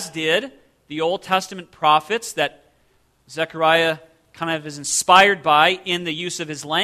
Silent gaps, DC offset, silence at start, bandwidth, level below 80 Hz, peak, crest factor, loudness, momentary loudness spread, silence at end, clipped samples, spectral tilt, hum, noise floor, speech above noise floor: none; under 0.1%; 0 s; 14 kHz; -62 dBFS; 0 dBFS; 20 dB; -19 LUFS; 15 LU; 0 s; under 0.1%; -2.5 dB/octave; none; -61 dBFS; 41 dB